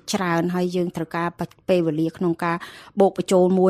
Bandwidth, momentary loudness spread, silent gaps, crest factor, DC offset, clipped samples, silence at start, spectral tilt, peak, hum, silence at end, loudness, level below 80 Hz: 15 kHz; 9 LU; none; 18 dB; under 0.1%; under 0.1%; 0.05 s; -6.5 dB/octave; -4 dBFS; none; 0 s; -22 LUFS; -60 dBFS